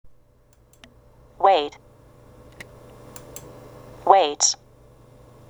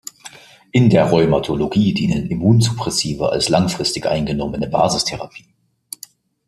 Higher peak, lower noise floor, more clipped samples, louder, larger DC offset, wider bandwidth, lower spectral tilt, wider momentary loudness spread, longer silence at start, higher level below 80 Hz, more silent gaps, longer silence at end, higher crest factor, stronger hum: about the same, -2 dBFS vs -2 dBFS; first, -56 dBFS vs -44 dBFS; neither; second, -20 LUFS vs -17 LUFS; neither; first, over 20 kHz vs 14.5 kHz; second, -1.5 dB/octave vs -5.5 dB/octave; first, 26 LU vs 20 LU; second, 0.05 s vs 0.25 s; second, -56 dBFS vs -42 dBFS; neither; second, 0.95 s vs 1.1 s; first, 24 dB vs 16 dB; neither